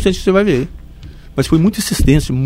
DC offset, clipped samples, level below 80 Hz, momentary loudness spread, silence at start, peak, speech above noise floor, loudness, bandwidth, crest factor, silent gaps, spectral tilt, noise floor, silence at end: under 0.1%; under 0.1%; -24 dBFS; 9 LU; 0 s; 0 dBFS; 21 dB; -14 LUFS; 16.5 kHz; 14 dB; none; -6 dB/octave; -34 dBFS; 0 s